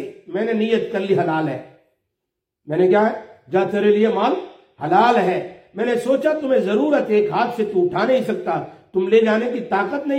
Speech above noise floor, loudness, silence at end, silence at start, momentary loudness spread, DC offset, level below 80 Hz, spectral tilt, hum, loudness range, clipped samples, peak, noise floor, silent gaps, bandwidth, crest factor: 62 dB; -19 LUFS; 0 s; 0 s; 10 LU; under 0.1%; -68 dBFS; -7 dB/octave; none; 3 LU; under 0.1%; -2 dBFS; -80 dBFS; none; 10.5 kHz; 16 dB